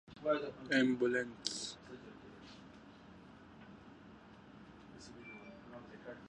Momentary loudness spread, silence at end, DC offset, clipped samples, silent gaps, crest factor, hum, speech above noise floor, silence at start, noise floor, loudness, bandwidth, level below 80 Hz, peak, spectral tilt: 24 LU; 0 s; under 0.1%; under 0.1%; none; 26 dB; none; 22 dB; 0.1 s; -58 dBFS; -36 LUFS; 11 kHz; -72 dBFS; -16 dBFS; -4 dB/octave